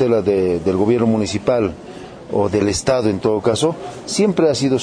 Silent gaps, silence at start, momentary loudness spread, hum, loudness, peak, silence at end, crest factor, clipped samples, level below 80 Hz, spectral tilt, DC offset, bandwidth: none; 0 s; 8 LU; none; -17 LUFS; -4 dBFS; 0 s; 14 dB; under 0.1%; -46 dBFS; -5.5 dB/octave; under 0.1%; 10.5 kHz